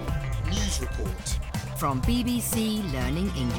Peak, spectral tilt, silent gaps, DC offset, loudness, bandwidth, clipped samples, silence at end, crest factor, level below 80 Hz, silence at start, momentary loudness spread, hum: -12 dBFS; -5 dB/octave; none; under 0.1%; -28 LUFS; 19 kHz; under 0.1%; 0 s; 14 dB; -32 dBFS; 0 s; 6 LU; none